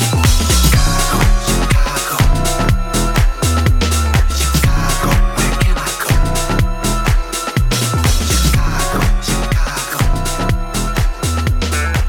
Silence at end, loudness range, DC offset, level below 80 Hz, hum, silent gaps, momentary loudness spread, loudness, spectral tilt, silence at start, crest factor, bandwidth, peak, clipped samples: 0 s; 2 LU; under 0.1%; -16 dBFS; none; none; 5 LU; -15 LUFS; -4 dB/octave; 0 s; 12 dB; 19 kHz; 0 dBFS; under 0.1%